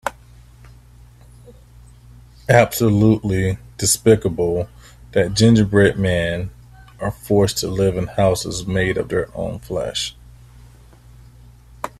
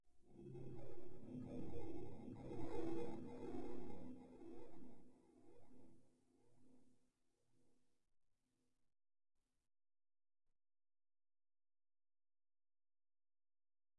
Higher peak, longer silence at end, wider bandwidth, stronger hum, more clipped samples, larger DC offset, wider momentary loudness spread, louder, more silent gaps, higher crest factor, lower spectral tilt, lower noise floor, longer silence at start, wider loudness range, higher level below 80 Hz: first, 0 dBFS vs -30 dBFS; about the same, 0.1 s vs 0 s; first, 14.5 kHz vs 10.5 kHz; first, 60 Hz at -40 dBFS vs none; neither; neither; about the same, 14 LU vs 14 LU; first, -18 LUFS vs -54 LUFS; neither; about the same, 20 dB vs 18 dB; second, -5 dB/octave vs -8 dB/octave; second, -45 dBFS vs -85 dBFS; about the same, 0.05 s vs 0 s; second, 6 LU vs 13 LU; first, -42 dBFS vs -72 dBFS